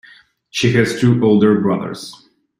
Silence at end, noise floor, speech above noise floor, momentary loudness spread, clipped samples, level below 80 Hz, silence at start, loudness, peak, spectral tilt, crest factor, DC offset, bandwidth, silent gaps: 0.5 s; -47 dBFS; 33 dB; 16 LU; under 0.1%; -52 dBFS; 0.55 s; -15 LUFS; -2 dBFS; -6.5 dB/octave; 14 dB; under 0.1%; 15.5 kHz; none